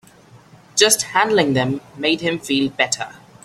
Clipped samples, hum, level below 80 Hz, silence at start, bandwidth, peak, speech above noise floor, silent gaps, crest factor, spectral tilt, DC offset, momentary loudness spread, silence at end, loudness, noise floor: under 0.1%; none; -58 dBFS; 0.35 s; 16 kHz; 0 dBFS; 29 dB; none; 20 dB; -3 dB/octave; under 0.1%; 9 LU; 0.3 s; -18 LUFS; -47 dBFS